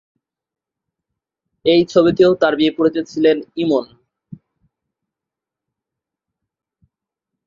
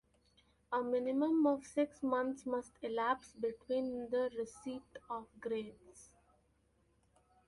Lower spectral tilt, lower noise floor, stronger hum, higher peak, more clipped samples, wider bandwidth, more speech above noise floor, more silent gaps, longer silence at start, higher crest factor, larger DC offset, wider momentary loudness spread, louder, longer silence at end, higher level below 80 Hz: first, -6.5 dB/octave vs -5 dB/octave; first, -87 dBFS vs -75 dBFS; neither; first, -2 dBFS vs -22 dBFS; neither; second, 7.4 kHz vs 11.5 kHz; first, 72 dB vs 37 dB; neither; first, 1.65 s vs 0.7 s; about the same, 18 dB vs 18 dB; neither; second, 7 LU vs 13 LU; first, -16 LUFS vs -38 LUFS; first, 3.6 s vs 1.45 s; first, -58 dBFS vs -74 dBFS